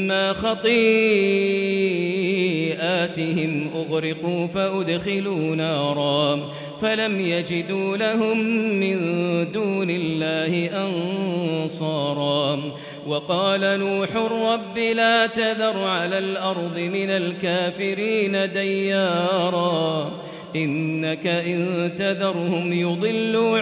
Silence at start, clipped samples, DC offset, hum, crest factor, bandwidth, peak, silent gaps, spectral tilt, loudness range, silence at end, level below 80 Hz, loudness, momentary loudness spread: 0 s; under 0.1%; under 0.1%; none; 16 dB; 4 kHz; -6 dBFS; none; -10 dB/octave; 3 LU; 0 s; -62 dBFS; -22 LUFS; 5 LU